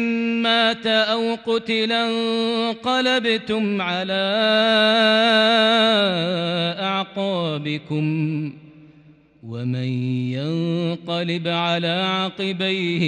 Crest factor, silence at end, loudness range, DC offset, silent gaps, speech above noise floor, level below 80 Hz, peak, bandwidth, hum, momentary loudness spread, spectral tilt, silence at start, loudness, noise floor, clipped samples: 16 dB; 0 s; 9 LU; under 0.1%; none; 30 dB; -66 dBFS; -6 dBFS; 10.5 kHz; none; 9 LU; -5.5 dB/octave; 0 s; -20 LUFS; -51 dBFS; under 0.1%